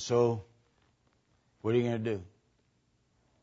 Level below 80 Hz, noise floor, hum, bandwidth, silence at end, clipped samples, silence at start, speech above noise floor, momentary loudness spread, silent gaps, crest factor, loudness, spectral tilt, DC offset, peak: -70 dBFS; -73 dBFS; none; 7.6 kHz; 1.15 s; under 0.1%; 0 s; 43 dB; 11 LU; none; 20 dB; -32 LUFS; -6.5 dB/octave; under 0.1%; -14 dBFS